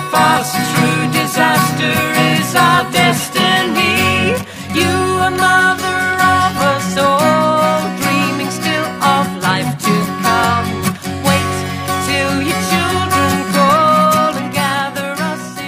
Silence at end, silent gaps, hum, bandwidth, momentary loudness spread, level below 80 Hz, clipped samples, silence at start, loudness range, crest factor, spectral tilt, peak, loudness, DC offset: 0 s; none; none; 15.5 kHz; 7 LU; -46 dBFS; under 0.1%; 0 s; 3 LU; 14 dB; -4 dB/octave; 0 dBFS; -13 LUFS; under 0.1%